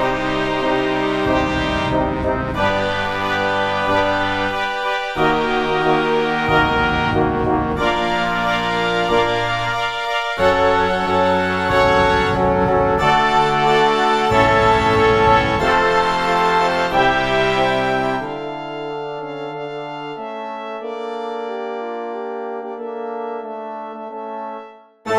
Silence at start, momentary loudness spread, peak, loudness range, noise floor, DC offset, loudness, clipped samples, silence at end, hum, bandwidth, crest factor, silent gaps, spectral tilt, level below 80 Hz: 0 s; 13 LU; 0 dBFS; 12 LU; -38 dBFS; under 0.1%; -18 LUFS; under 0.1%; 0 s; none; 14 kHz; 18 dB; none; -5.5 dB/octave; -36 dBFS